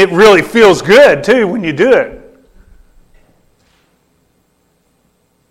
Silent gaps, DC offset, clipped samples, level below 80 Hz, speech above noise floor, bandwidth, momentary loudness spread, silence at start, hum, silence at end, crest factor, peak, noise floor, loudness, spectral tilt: none; under 0.1%; under 0.1%; -44 dBFS; 50 dB; 16 kHz; 7 LU; 0 s; none; 3.35 s; 12 dB; 0 dBFS; -57 dBFS; -8 LUFS; -4.5 dB/octave